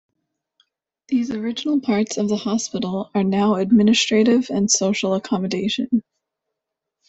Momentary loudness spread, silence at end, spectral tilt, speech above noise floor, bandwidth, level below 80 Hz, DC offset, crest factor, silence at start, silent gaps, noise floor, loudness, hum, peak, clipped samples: 8 LU; 1.05 s; -4 dB/octave; 63 dB; 8.2 kHz; -60 dBFS; under 0.1%; 16 dB; 1.1 s; none; -82 dBFS; -20 LUFS; none; -4 dBFS; under 0.1%